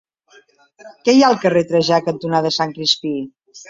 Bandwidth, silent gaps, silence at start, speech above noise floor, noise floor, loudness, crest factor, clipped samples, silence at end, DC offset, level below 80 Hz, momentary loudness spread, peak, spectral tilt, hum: 7.8 kHz; none; 0.85 s; 35 dB; -52 dBFS; -16 LUFS; 16 dB; under 0.1%; 0.1 s; under 0.1%; -62 dBFS; 11 LU; -2 dBFS; -4.5 dB/octave; none